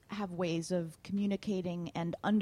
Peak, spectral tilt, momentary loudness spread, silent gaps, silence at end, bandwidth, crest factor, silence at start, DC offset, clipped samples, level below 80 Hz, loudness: -20 dBFS; -6.5 dB/octave; 5 LU; none; 0 s; 12 kHz; 14 dB; 0.1 s; under 0.1%; under 0.1%; -68 dBFS; -36 LUFS